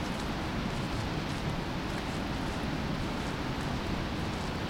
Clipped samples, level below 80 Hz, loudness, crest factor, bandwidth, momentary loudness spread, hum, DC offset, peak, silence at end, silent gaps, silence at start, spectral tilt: under 0.1%; -42 dBFS; -34 LUFS; 12 dB; 16.5 kHz; 1 LU; none; under 0.1%; -20 dBFS; 0 s; none; 0 s; -5.5 dB/octave